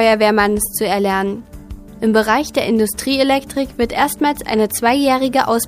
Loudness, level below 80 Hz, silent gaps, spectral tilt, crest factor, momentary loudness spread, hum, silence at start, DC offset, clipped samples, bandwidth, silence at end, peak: -16 LUFS; -40 dBFS; none; -4 dB/octave; 16 dB; 9 LU; none; 0 s; under 0.1%; under 0.1%; 15.5 kHz; 0 s; 0 dBFS